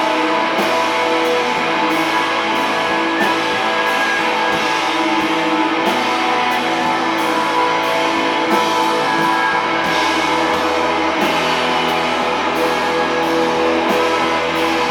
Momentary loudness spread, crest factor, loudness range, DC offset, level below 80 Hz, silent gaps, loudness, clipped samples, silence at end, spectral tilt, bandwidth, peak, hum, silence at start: 1 LU; 14 dB; 1 LU; under 0.1%; -52 dBFS; none; -16 LUFS; under 0.1%; 0 s; -3 dB/octave; 19.5 kHz; -2 dBFS; none; 0 s